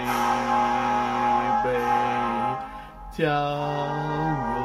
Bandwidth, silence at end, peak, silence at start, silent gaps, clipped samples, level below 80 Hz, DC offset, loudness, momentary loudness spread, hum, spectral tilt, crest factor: 14.5 kHz; 0 s; -10 dBFS; 0 s; none; under 0.1%; -46 dBFS; under 0.1%; -24 LUFS; 6 LU; none; -5.5 dB/octave; 14 dB